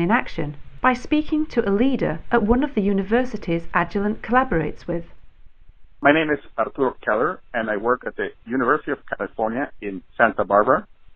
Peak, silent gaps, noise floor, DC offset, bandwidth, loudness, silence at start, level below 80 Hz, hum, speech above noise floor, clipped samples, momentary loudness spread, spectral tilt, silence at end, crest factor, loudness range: -2 dBFS; none; -43 dBFS; under 0.1%; 7.2 kHz; -22 LUFS; 0 s; -40 dBFS; none; 22 dB; under 0.1%; 11 LU; -7.5 dB/octave; 0.05 s; 20 dB; 2 LU